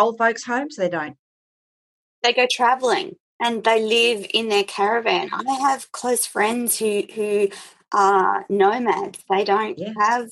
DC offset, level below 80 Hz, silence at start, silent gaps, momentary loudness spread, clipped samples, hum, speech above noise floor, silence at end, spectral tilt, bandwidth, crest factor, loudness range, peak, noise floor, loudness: under 0.1%; -74 dBFS; 0 s; 1.19-2.22 s, 3.20-3.39 s; 8 LU; under 0.1%; none; over 70 dB; 0 s; -2.5 dB/octave; 13.5 kHz; 18 dB; 2 LU; -4 dBFS; under -90 dBFS; -20 LUFS